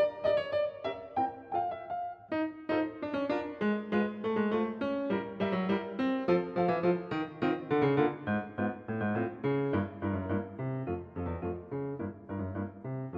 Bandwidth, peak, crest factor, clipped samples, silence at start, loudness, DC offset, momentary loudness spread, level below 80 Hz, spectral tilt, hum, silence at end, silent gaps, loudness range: 6.6 kHz; -14 dBFS; 18 dB; under 0.1%; 0 s; -33 LUFS; under 0.1%; 9 LU; -62 dBFS; -9 dB/octave; none; 0 s; none; 4 LU